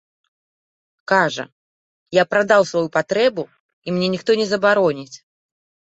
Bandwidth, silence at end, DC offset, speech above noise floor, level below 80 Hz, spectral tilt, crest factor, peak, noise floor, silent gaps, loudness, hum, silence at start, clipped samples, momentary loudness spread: 8.2 kHz; 0.75 s; under 0.1%; over 72 dB; -64 dBFS; -5 dB/octave; 18 dB; -2 dBFS; under -90 dBFS; 1.52-2.06 s, 3.60-3.82 s; -18 LUFS; none; 1.1 s; under 0.1%; 19 LU